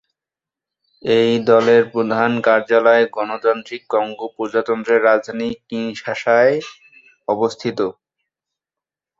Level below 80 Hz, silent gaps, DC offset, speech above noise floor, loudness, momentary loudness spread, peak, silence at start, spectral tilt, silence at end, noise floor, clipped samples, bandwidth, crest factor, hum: -64 dBFS; none; under 0.1%; 72 dB; -17 LUFS; 12 LU; -2 dBFS; 1.05 s; -5.5 dB/octave; 1.3 s; -88 dBFS; under 0.1%; 7.6 kHz; 16 dB; none